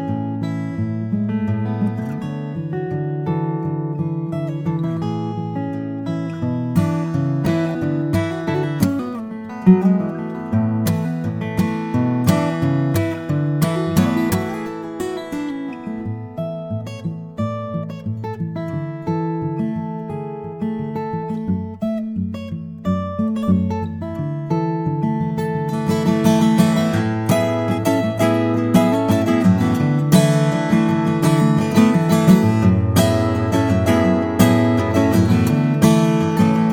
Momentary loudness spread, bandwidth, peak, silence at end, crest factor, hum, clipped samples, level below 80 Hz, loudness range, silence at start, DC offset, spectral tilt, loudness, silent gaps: 12 LU; 18 kHz; 0 dBFS; 0 s; 18 dB; none; under 0.1%; -48 dBFS; 9 LU; 0 s; under 0.1%; -7 dB/octave; -19 LUFS; none